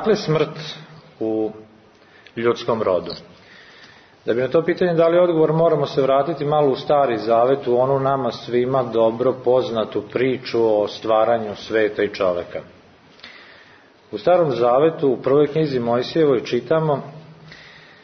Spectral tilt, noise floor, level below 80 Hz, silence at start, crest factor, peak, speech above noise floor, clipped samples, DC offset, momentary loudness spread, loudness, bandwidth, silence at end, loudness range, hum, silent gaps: -7 dB/octave; -50 dBFS; -60 dBFS; 0 s; 14 dB; -6 dBFS; 31 dB; under 0.1%; under 0.1%; 11 LU; -19 LUFS; 6.4 kHz; 0.35 s; 6 LU; none; none